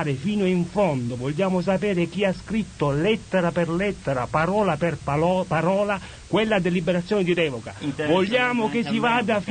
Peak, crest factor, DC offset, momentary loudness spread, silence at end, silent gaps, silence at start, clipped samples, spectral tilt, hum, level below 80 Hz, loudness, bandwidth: -8 dBFS; 14 dB; under 0.1%; 5 LU; 0 s; none; 0 s; under 0.1%; -6.5 dB/octave; none; -48 dBFS; -23 LUFS; 9.6 kHz